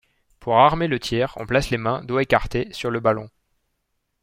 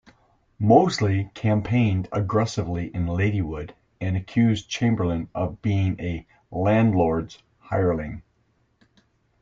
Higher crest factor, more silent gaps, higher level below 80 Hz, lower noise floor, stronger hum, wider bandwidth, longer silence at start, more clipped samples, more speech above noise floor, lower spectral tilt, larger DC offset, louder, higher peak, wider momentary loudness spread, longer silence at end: about the same, 20 dB vs 20 dB; neither; first, -42 dBFS vs -48 dBFS; first, -74 dBFS vs -66 dBFS; neither; first, 16 kHz vs 7.6 kHz; second, 0.4 s vs 0.6 s; neither; first, 53 dB vs 44 dB; about the same, -6 dB/octave vs -7 dB/octave; neither; about the same, -21 LUFS vs -23 LUFS; about the same, -2 dBFS vs -4 dBFS; second, 10 LU vs 13 LU; second, 0.95 s vs 1.2 s